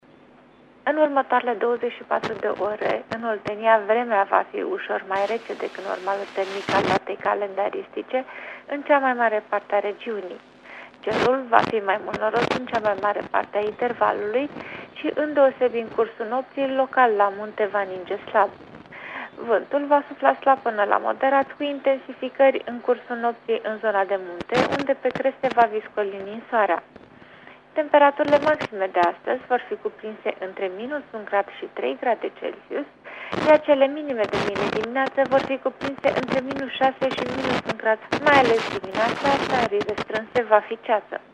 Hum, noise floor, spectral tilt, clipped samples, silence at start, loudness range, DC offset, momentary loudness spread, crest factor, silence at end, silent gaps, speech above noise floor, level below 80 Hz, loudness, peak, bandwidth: none; -52 dBFS; -5.5 dB/octave; under 0.1%; 0.85 s; 4 LU; under 0.1%; 12 LU; 22 dB; 0.15 s; none; 29 dB; -60 dBFS; -23 LUFS; 0 dBFS; 9.8 kHz